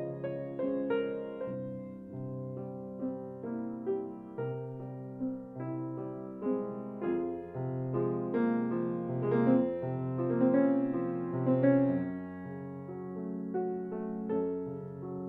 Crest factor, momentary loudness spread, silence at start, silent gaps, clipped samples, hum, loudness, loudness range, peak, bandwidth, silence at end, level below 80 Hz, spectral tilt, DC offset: 18 dB; 14 LU; 0 s; none; under 0.1%; none; -34 LUFS; 9 LU; -14 dBFS; 4 kHz; 0 s; -70 dBFS; -11.5 dB/octave; under 0.1%